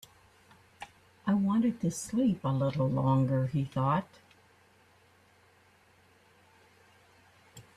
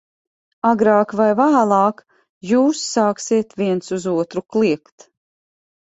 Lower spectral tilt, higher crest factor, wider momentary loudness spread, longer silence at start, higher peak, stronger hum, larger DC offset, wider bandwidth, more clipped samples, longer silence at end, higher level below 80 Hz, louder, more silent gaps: first, -7.5 dB/octave vs -5.5 dB/octave; about the same, 16 dB vs 16 dB; first, 22 LU vs 8 LU; first, 0.8 s vs 0.65 s; second, -16 dBFS vs -2 dBFS; neither; neither; first, 13.5 kHz vs 8.2 kHz; neither; second, 0.15 s vs 1.15 s; about the same, -64 dBFS vs -62 dBFS; second, -30 LUFS vs -18 LUFS; second, none vs 2.29-2.41 s